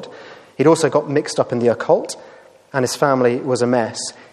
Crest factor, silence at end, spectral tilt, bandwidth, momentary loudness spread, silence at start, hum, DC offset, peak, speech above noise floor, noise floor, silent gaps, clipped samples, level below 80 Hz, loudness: 18 dB; 0.2 s; -5 dB/octave; 13.5 kHz; 13 LU; 0 s; none; under 0.1%; -2 dBFS; 22 dB; -40 dBFS; none; under 0.1%; -66 dBFS; -18 LUFS